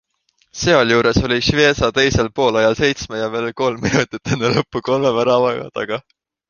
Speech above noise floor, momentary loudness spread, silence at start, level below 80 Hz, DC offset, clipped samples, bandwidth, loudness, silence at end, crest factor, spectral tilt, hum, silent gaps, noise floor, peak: 47 dB; 9 LU; 0.55 s; -38 dBFS; under 0.1%; under 0.1%; 7.2 kHz; -17 LUFS; 0.5 s; 16 dB; -4.5 dB/octave; none; none; -63 dBFS; 0 dBFS